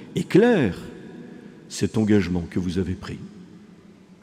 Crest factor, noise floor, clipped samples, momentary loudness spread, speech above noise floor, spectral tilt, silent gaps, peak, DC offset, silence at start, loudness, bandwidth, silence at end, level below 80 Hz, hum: 20 dB; -49 dBFS; under 0.1%; 23 LU; 27 dB; -6.5 dB/octave; none; -4 dBFS; under 0.1%; 0 s; -22 LUFS; 14.5 kHz; 0.65 s; -54 dBFS; none